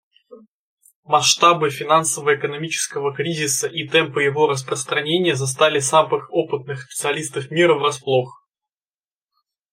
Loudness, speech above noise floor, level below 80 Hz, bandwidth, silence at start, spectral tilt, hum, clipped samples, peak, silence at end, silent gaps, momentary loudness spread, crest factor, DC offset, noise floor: -19 LUFS; over 71 dB; -66 dBFS; 16 kHz; 0.3 s; -3 dB/octave; none; under 0.1%; 0 dBFS; 1.45 s; 0.48-0.77 s, 0.96-1.03 s; 8 LU; 20 dB; under 0.1%; under -90 dBFS